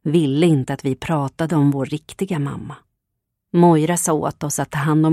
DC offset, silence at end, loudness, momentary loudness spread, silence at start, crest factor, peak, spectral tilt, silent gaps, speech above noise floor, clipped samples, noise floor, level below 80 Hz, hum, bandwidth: under 0.1%; 0 s; -19 LUFS; 12 LU; 0.05 s; 18 dB; -2 dBFS; -6 dB/octave; none; 60 dB; under 0.1%; -78 dBFS; -52 dBFS; none; 14.5 kHz